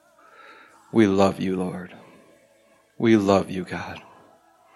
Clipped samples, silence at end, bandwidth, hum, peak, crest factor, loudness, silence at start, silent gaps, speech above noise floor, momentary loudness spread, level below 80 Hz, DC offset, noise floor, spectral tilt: under 0.1%; 0.75 s; 12 kHz; none; -4 dBFS; 20 dB; -22 LUFS; 0.95 s; none; 38 dB; 19 LU; -64 dBFS; under 0.1%; -59 dBFS; -6.5 dB/octave